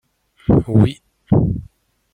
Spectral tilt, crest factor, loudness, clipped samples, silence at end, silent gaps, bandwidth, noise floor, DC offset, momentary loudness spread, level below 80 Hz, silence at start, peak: -10 dB/octave; 16 dB; -17 LUFS; under 0.1%; 0.5 s; none; 9.8 kHz; -46 dBFS; under 0.1%; 13 LU; -34 dBFS; 0.5 s; -2 dBFS